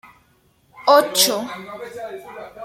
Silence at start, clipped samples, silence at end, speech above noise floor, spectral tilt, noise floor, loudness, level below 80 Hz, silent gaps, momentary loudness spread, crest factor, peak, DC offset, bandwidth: 0.75 s; under 0.1%; 0 s; 40 dB; -1 dB/octave; -59 dBFS; -16 LUFS; -66 dBFS; none; 20 LU; 20 dB; -2 dBFS; under 0.1%; 16.5 kHz